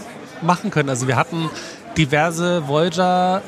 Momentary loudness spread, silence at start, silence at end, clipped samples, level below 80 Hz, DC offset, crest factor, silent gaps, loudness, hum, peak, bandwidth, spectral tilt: 9 LU; 0 s; 0 s; under 0.1%; -50 dBFS; under 0.1%; 18 dB; none; -19 LUFS; none; 0 dBFS; 14 kHz; -5 dB/octave